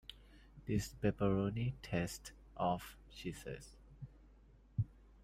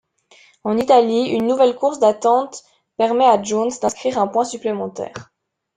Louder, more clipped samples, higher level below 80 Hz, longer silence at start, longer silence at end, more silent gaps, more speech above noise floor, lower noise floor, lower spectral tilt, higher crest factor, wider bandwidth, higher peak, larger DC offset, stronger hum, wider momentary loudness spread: second, -40 LUFS vs -18 LUFS; neither; about the same, -58 dBFS vs -62 dBFS; second, 0.1 s vs 0.65 s; second, 0.25 s vs 0.55 s; neither; second, 24 dB vs 35 dB; first, -63 dBFS vs -52 dBFS; first, -6.5 dB/octave vs -4.5 dB/octave; about the same, 20 dB vs 16 dB; first, 16 kHz vs 9.6 kHz; second, -22 dBFS vs -2 dBFS; neither; neither; first, 20 LU vs 16 LU